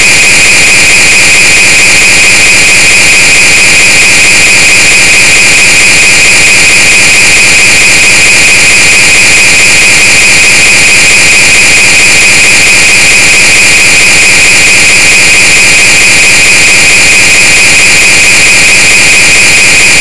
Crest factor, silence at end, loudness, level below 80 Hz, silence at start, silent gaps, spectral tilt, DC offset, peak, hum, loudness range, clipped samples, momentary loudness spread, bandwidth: 4 dB; 0 s; 0 LUFS; -26 dBFS; 0 s; none; 0 dB/octave; 20%; 0 dBFS; none; 0 LU; 30%; 0 LU; 12 kHz